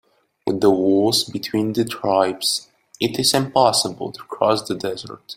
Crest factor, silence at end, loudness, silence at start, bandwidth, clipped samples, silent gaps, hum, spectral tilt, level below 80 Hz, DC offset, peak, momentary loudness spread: 20 dB; 0.05 s; -19 LUFS; 0.45 s; 16.5 kHz; under 0.1%; none; none; -4 dB/octave; -58 dBFS; under 0.1%; 0 dBFS; 10 LU